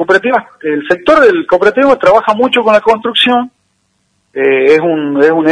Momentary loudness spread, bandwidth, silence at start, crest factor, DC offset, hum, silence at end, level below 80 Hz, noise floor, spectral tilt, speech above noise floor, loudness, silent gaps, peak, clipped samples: 7 LU; 10.5 kHz; 0 s; 10 dB; under 0.1%; none; 0 s; -48 dBFS; -60 dBFS; -5 dB/octave; 51 dB; -9 LUFS; none; 0 dBFS; 1%